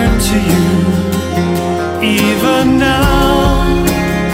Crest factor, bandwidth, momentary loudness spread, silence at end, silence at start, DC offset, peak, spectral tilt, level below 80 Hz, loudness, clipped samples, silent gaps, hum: 12 dB; 16.5 kHz; 5 LU; 0 s; 0 s; under 0.1%; 0 dBFS; -5.5 dB/octave; -20 dBFS; -12 LUFS; under 0.1%; none; none